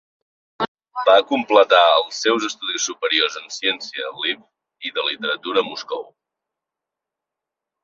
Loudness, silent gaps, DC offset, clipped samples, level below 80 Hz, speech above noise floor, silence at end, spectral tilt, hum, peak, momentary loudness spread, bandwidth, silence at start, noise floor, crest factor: -19 LUFS; 0.68-0.75 s; under 0.1%; under 0.1%; -70 dBFS; 66 dB; 1.8 s; -1 dB/octave; none; -2 dBFS; 14 LU; 7.8 kHz; 0.6 s; -85 dBFS; 20 dB